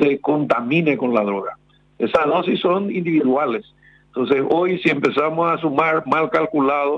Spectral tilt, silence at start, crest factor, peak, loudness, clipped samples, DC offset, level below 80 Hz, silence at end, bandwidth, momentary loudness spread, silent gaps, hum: -7.5 dB/octave; 0 s; 16 dB; -4 dBFS; -19 LUFS; under 0.1%; under 0.1%; -60 dBFS; 0 s; 8 kHz; 6 LU; none; none